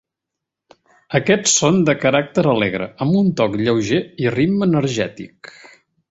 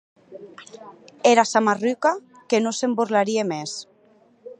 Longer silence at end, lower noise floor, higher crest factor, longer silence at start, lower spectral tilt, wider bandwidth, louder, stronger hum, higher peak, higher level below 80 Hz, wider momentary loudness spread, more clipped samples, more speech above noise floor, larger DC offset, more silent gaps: first, 0.85 s vs 0.05 s; first, -82 dBFS vs -57 dBFS; about the same, 16 dB vs 20 dB; first, 1.1 s vs 0.3 s; about the same, -4.5 dB/octave vs -3.5 dB/octave; second, 8.2 kHz vs 11 kHz; first, -17 LUFS vs -21 LUFS; neither; about the same, -2 dBFS vs -2 dBFS; first, -52 dBFS vs -78 dBFS; second, 8 LU vs 24 LU; neither; first, 65 dB vs 35 dB; neither; neither